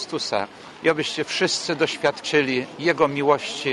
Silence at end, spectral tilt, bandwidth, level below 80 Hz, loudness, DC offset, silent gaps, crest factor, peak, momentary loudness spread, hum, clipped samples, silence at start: 0 s; -3.5 dB/octave; 11.5 kHz; -64 dBFS; -22 LUFS; under 0.1%; none; 18 dB; -4 dBFS; 5 LU; none; under 0.1%; 0 s